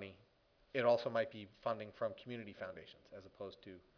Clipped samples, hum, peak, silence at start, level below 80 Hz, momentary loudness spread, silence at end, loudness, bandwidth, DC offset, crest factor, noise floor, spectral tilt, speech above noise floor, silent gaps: under 0.1%; none; -22 dBFS; 0 s; -78 dBFS; 22 LU; 0.15 s; -41 LUFS; 5.4 kHz; under 0.1%; 20 dB; -73 dBFS; -3.5 dB/octave; 31 dB; none